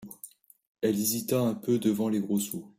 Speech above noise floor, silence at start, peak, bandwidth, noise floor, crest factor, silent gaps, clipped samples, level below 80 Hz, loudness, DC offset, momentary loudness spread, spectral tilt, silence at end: 24 dB; 0 s; -14 dBFS; 16 kHz; -52 dBFS; 16 dB; 0.67-0.75 s; under 0.1%; -70 dBFS; -28 LUFS; under 0.1%; 17 LU; -5 dB/octave; 0.1 s